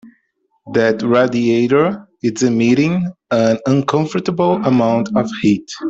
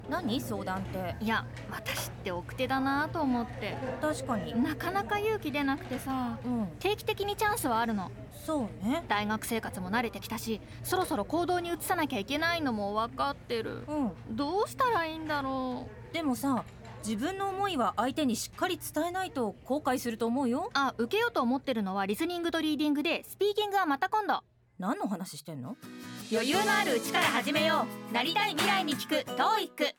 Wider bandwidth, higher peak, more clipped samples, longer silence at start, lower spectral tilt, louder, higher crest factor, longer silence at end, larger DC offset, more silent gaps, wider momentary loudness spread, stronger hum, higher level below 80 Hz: second, 7.8 kHz vs 19 kHz; first, -2 dBFS vs -12 dBFS; neither; about the same, 0.05 s vs 0 s; first, -6.5 dB/octave vs -4 dB/octave; first, -16 LUFS vs -31 LUFS; about the same, 14 dB vs 18 dB; about the same, 0 s vs 0.05 s; neither; neither; second, 6 LU vs 9 LU; neither; about the same, -54 dBFS vs -56 dBFS